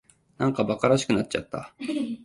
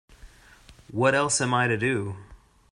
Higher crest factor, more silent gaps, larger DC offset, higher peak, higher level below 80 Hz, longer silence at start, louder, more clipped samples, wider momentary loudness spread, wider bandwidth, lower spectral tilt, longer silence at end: about the same, 18 dB vs 20 dB; neither; neither; about the same, -8 dBFS vs -8 dBFS; about the same, -58 dBFS vs -56 dBFS; first, 0.4 s vs 0.25 s; about the same, -26 LUFS vs -24 LUFS; neither; second, 11 LU vs 14 LU; about the same, 11.5 kHz vs 11.5 kHz; first, -5.5 dB/octave vs -4 dB/octave; second, 0 s vs 0.35 s